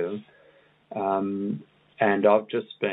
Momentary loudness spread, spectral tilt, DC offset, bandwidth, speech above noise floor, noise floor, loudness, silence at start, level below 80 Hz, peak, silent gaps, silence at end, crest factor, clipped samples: 15 LU; -10 dB/octave; under 0.1%; 4.1 kHz; 34 dB; -59 dBFS; -25 LUFS; 0 s; -78 dBFS; -6 dBFS; none; 0 s; 22 dB; under 0.1%